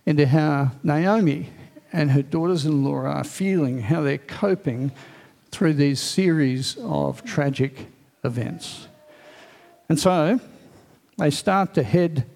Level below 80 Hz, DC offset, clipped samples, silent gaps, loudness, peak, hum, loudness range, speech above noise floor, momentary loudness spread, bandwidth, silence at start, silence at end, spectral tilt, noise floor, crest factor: -58 dBFS; under 0.1%; under 0.1%; none; -22 LUFS; -4 dBFS; none; 4 LU; 32 dB; 11 LU; 15 kHz; 0.05 s; 0.05 s; -6.5 dB/octave; -53 dBFS; 20 dB